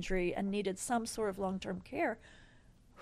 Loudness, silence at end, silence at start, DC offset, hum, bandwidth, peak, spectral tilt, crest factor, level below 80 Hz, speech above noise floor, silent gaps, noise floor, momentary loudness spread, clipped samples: -37 LUFS; 0 s; 0 s; under 0.1%; none; 14.5 kHz; -22 dBFS; -5 dB/octave; 16 dB; -52 dBFS; 26 dB; none; -62 dBFS; 6 LU; under 0.1%